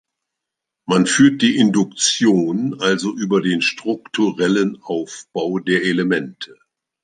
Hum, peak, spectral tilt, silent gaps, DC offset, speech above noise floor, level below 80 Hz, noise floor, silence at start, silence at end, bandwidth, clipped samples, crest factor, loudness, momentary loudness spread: none; -2 dBFS; -4 dB/octave; none; under 0.1%; 65 dB; -64 dBFS; -82 dBFS; 0.9 s; 0.6 s; 10 kHz; under 0.1%; 16 dB; -18 LUFS; 12 LU